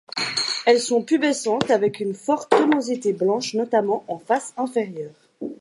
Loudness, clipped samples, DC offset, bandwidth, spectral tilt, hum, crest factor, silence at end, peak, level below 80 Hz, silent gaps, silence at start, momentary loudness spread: -21 LUFS; under 0.1%; under 0.1%; 11.5 kHz; -3.5 dB/octave; none; 20 dB; 0.05 s; 0 dBFS; -70 dBFS; none; 0.15 s; 9 LU